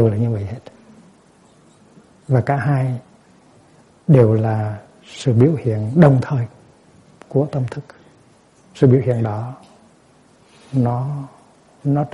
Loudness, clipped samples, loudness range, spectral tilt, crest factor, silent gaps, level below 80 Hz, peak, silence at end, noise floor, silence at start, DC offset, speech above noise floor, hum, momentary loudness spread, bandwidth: -18 LUFS; under 0.1%; 7 LU; -9 dB/octave; 18 dB; none; -54 dBFS; 0 dBFS; 0.05 s; -52 dBFS; 0 s; under 0.1%; 35 dB; none; 17 LU; 10.5 kHz